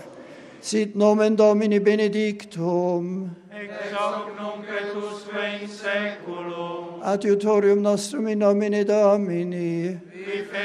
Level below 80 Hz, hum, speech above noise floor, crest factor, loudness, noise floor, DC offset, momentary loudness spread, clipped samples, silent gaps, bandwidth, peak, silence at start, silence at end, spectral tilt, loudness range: -76 dBFS; none; 20 dB; 18 dB; -23 LUFS; -43 dBFS; under 0.1%; 14 LU; under 0.1%; none; 11.5 kHz; -6 dBFS; 0 s; 0 s; -6 dB/octave; 8 LU